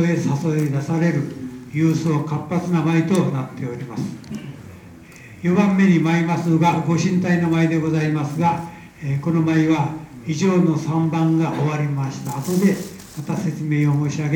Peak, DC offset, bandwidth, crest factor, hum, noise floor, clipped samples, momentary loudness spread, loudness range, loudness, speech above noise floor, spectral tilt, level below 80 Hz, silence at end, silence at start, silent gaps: -4 dBFS; under 0.1%; 17.5 kHz; 16 dB; none; -41 dBFS; under 0.1%; 12 LU; 4 LU; -20 LUFS; 22 dB; -7 dB/octave; -56 dBFS; 0 s; 0 s; none